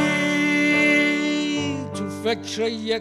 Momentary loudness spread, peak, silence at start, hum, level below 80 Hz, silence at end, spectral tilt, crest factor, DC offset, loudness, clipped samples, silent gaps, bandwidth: 10 LU; -8 dBFS; 0 s; none; -64 dBFS; 0 s; -4 dB/octave; 14 dB; under 0.1%; -21 LUFS; under 0.1%; none; 13 kHz